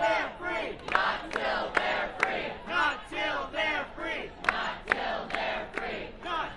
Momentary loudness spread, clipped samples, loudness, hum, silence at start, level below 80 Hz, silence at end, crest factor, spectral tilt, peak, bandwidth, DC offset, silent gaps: 7 LU; under 0.1%; -30 LUFS; none; 0 s; -52 dBFS; 0 s; 26 dB; -3.5 dB/octave; -6 dBFS; 11.5 kHz; under 0.1%; none